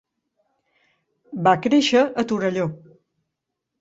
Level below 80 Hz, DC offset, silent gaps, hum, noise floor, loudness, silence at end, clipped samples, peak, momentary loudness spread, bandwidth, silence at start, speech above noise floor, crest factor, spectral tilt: -64 dBFS; under 0.1%; none; none; -81 dBFS; -20 LUFS; 1.05 s; under 0.1%; -4 dBFS; 11 LU; 8 kHz; 1.3 s; 62 dB; 20 dB; -5 dB/octave